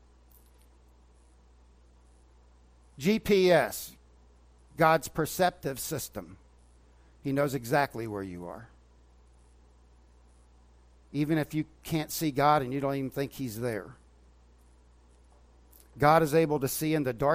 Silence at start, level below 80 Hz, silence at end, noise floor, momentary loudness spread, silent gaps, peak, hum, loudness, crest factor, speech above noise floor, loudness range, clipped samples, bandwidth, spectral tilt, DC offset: 3 s; -56 dBFS; 0 s; -59 dBFS; 16 LU; none; -8 dBFS; 60 Hz at -55 dBFS; -28 LUFS; 24 dB; 31 dB; 9 LU; under 0.1%; 16 kHz; -5.5 dB/octave; under 0.1%